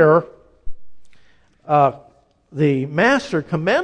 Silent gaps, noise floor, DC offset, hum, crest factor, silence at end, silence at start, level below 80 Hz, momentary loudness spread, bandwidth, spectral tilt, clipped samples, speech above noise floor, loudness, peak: none; -52 dBFS; under 0.1%; none; 18 dB; 0 s; 0 s; -46 dBFS; 7 LU; 9.8 kHz; -6.5 dB/octave; under 0.1%; 36 dB; -18 LUFS; -2 dBFS